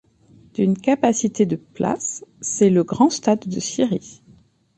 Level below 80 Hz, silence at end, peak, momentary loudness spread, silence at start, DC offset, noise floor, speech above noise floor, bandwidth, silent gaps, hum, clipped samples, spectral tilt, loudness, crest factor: -60 dBFS; 0.65 s; -4 dBFS; 10 LU; 0.6 s; under 0.1%; -53 dBFS; 33 dB; 9.4 kHz; none; none; under 0.1%; -5.5 dB/octave; -20 LUFS; 18 dB